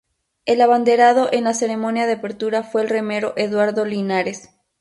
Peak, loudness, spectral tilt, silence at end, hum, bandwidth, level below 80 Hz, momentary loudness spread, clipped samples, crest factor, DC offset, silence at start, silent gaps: -2 dBFS; -18 LUFS; -4.5 dB/octave; 0.4 s; none; 11.5 kHz; -66 dBFS; 9 LU; under 0.1%; 16 dB; under 0.1%; 0.45 s; none